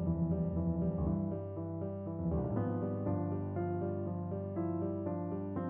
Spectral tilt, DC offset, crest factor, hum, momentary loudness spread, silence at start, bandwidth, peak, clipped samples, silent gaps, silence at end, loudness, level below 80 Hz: -12.5 dB/octave; under 0.1%; 14 dB; none; 6 LU; 0 s; 3 kHz; -20 dBFS; under 0.1%; none; 0 s; -37 LUFS; -50 dBFS